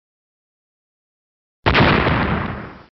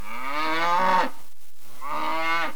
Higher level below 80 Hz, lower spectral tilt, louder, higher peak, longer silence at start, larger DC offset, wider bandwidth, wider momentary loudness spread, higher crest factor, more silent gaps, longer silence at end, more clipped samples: first, -34 dBFS vs -64 dBFS; about the same, -4 dB/octave vs -3.5 dB/octave; first, -17 LUFS vs -25 LUFS; first, -4 dBFS vs -10 dBFS; first, 1.65 s vs 0 s; second, under 0.1% vs 6%; second, 6.2 kHz vs over 20 kHz; about the same, 13 LU vs 11 LU; about the same, 16 dB vs 16 dB; neither; first, 0.15 s vs 0 s; neither